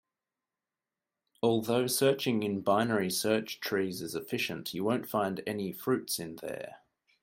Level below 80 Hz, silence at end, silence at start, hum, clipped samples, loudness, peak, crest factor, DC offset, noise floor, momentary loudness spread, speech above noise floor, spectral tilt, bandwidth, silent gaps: -74 dBFS; 0.45 s; 1.45 s; none; under 0.1%; -31 LUFS; -14 dBFS; 20 dB; under 0.1%; under -90 dBFS; 9 LU; over 59 dB; -4.5 dB/octave; 16.5 kHz; none